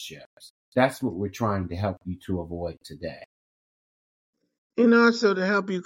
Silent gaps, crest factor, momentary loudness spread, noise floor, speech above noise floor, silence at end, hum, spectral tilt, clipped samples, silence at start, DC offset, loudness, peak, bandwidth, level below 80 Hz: 0.26-0.37 s, 0.50-0.72 s, 3.26-4.33 s, 4.58-4.70 s; 20 dB; 19 LU; under -90 dBFS; over 65 dB; 0.05 s; none; -6 dB/octave; under 0.1%; 0 s; under 0.1%; -24 LUFS; -6 dBFS; 16.5 kHz; -56 dBFS